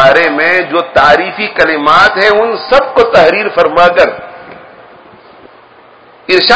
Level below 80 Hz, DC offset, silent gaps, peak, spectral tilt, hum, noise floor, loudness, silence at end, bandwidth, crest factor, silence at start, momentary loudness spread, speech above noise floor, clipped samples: -42 dBFS; under 0.1%; none; 0 dBFS; -4.5 dB/octave; none; -39 dBFS; -8 LUFS; 0 s; 8 kHz; 10 dB; 0 s; 6 LU; 31 dB; 2%